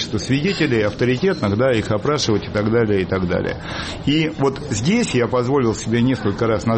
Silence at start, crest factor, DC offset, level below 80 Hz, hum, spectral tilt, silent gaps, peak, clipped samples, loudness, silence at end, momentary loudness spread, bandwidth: 0 s; 12 dB; under 0.1%; -42 dBFS; none; -5.5 dB/octave; none; -6 dBFS; under 0.1%; -19 LUFS; 0 s; 4 LU; 8.8 kHz